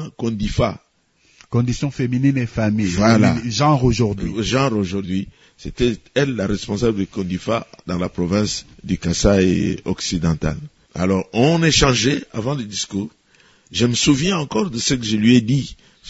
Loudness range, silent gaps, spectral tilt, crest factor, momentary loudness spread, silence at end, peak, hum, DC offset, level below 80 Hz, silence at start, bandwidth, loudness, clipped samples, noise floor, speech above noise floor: 4 LU; none; -5 dB/octave; 18 dB; 11 LU; 0 s; 0 dBFS; none; under 0.1%; -36 dBFS; 0 s; 8 kHz; -19 LUFS; under 0.1%; -59 dBFS; 41 dB